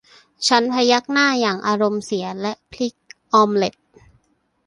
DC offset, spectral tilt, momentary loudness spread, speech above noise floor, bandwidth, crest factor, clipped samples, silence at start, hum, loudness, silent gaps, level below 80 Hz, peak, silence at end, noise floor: under 0.1%; -3.5 dB/octave; 11 LU; 46 dB; 11.5 kHz; 18 dB; under 0.1%; 0.4 s; none; -19 LUFS; none; -62 dBFS; -2 dBFS; 0.95 s; -64 dBFS